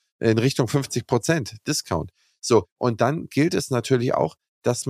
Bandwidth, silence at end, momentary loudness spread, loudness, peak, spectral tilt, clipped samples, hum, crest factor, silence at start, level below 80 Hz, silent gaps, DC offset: 15.5 kHz; 0 s; 7 LU; -23 LUFS; -4 dBFS; -5.5 dB/octave; under 0.1%; none; 18 dB; 0.2 s; -54 dBFS; 2.72-2.76 s, 4.48-4.62 s; under 0.1%